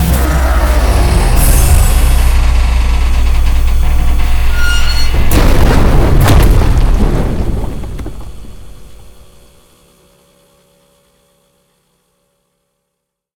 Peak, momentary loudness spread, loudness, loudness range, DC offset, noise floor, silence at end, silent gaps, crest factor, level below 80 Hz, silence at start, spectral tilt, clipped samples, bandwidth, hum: 0 dBFS; 11 LU; -12 LUFS; 11 LU; under 0.1%; -73 dBFS; 4.35 s; none; 10 dB; -12 dBFS; 0 s; -5 dB/octave; 0.4%; 20 kHz; none